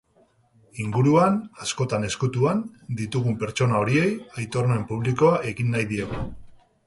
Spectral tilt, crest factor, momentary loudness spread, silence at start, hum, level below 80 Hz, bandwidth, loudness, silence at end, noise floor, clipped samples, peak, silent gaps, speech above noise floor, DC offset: -6.5 dB/octave; 16 dB; 12 LU; 0.75 s; none; -50 dBFS; 11.5 kHz; -24 LUFS; 0.35 s; -61 dBFS; under 0.1%; -6 dBFS; none; 38 dB; under 0.1%